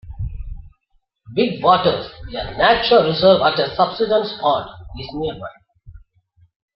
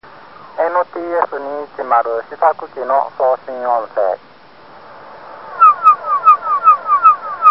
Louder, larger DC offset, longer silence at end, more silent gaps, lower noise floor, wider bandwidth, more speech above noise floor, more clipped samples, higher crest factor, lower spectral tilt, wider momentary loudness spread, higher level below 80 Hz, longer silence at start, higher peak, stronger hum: second, -17 LUFS vs -14 LUFS; second, under 0.1% vs 0.4%; first, 0.8 s vs 0 s; neither; first, -64 dBFS vs -42 dBFS; about the same, 5.8 kHz vs 5.8 kHz; first, 47 dB vs 24 dB; neither; about the same, 18 dB vs 16 dB; first, -8.5 dB/octave vs -6 dB/octave; first, 20 LU vs 15 LU; first, -38 dBFS vs -66 dBFS; second, 0.05 s vs 0.4 s; about the same, -2 dBFS vs 0 dBFS; neither